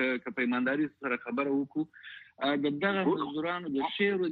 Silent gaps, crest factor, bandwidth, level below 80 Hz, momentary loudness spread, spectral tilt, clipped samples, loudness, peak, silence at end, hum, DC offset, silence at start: none; 18 dB; 4.7 kHz; -74 dBFS; 7 LU; -8.5 dB/octave; under 0.1%; -31 LUFS; -14 dBFS; 0 s; none; under 0.1%; 0 s